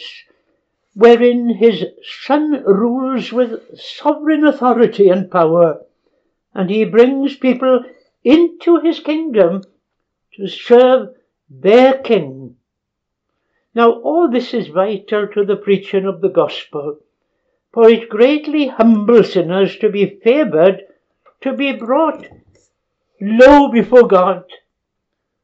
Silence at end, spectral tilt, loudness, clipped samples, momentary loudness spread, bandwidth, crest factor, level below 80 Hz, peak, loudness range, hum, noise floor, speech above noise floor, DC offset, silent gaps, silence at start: 0.9 s; -7.5 dB/octave; -13 LUFS; under 0.1%; 15 LU; 7.6 kHz; 14 dB; -50 dBFS; 0 dBFS; 4 LU; none; -76 dBFS; 64 dB; under 0.1%; none; 0 s